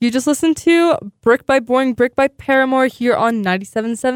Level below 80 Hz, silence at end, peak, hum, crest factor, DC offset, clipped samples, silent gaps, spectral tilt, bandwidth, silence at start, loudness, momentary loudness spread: -52 dBFS; 0 s; -4 dBFS; none; 12 dB; under 0.1%; under 0.1%; none; -4.5 dB/octave; 16.5 kHz; 0 s; -16 LUFS; 6 LU